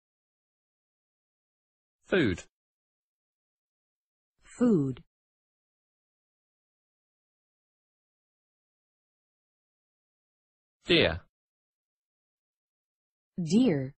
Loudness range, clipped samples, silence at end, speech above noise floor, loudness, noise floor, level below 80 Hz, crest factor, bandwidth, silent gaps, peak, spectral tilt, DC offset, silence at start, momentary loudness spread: 4 LU; under 0.1%; 0.1 s; over 64 dB; -27 LUFS; under -90 dBFS; -60 dBFS; 24 dB; 8.4 kHz; 2.49-4.35 s, 5.07-10.80 s, 11.29-13.32 s; -10 dBFS; -6 dB/octave; under 0.1%; 2.1 s; 18 LU